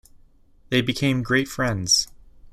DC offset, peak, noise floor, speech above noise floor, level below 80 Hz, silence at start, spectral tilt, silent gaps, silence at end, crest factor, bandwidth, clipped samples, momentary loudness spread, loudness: under 0.1%; -6 dBFS; -53 dBFS; 31 dB; -48 dBFS; 0.7 s; -3.5 dB/octave; none; 0 s; 18 dB; 15 kHz; under 0.1%; 6 LU; -21 LUFS